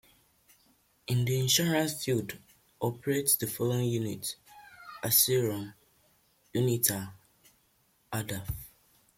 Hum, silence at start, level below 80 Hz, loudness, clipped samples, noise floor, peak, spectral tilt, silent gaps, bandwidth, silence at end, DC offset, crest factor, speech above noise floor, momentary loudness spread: none; 1.1 s; -60 dBFS; -29 LUFS; under 0.1%; -69 dBFS; -10 dBFS; -4 dB/octave; none; 16.5 kHz; 0.5 s; under 0.1%; 22 dB; 40 dB; 19 LU